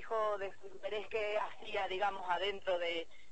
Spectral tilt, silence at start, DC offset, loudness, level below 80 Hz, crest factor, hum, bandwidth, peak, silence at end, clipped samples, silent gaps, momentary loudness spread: -3.5 dB/octave; 0 s; 0.5%; -38 LUFS; -68 dBFS; 16 dB; none; 8.4 kHz; -22 dBFS; 0.1 s; under 0.1%; none; 7 LU